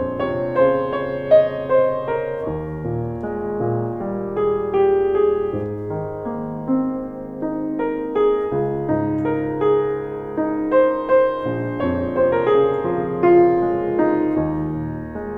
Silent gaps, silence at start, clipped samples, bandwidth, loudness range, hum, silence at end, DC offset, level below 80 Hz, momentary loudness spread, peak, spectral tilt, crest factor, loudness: none; 0 s; under 0.1%; 4.7 kHz; 5 LU; none; 0 s; under 0.1%; -44 dBFS; 10 LU; -4 dBFS; -10 dB/octave; 16 dB; -20 LUFS